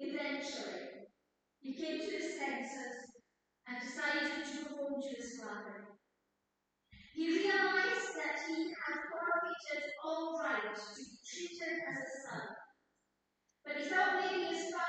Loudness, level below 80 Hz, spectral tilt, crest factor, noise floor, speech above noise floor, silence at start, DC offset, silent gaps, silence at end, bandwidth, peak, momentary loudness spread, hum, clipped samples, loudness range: -38 LUFS; -82 dBFS; -2.5 dB/octave; 20 dB; -85 dBFS; 46 dB; 0 s; under 0.1%; none; 0 s; 9 kHz; -20 dBFS; 17 LU; none; under 0.1%; 7 LU